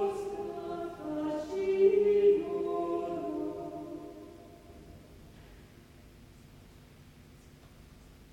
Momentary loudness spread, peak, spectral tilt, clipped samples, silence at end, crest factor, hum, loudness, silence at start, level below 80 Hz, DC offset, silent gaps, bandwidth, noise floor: 28 LU; -14 dBFS; -7 dB/octave; under 0.1%; 0.1 s; 20 dB; none; -31 LUFS; 0 s; -60 dBFS; under 0.1%; none; 10.5 kHz; -55 dBFS